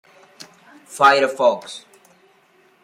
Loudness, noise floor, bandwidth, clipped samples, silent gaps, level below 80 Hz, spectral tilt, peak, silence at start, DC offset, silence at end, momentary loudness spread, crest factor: -17 LUFS; -56 dBFS; 16 kHz; under 0.1%; none; -78 dBFS; -2.5 dB/octave; -2 dBFS; 0.9 s; under 0.1%; 1.05 s; 23 LU; 18 dB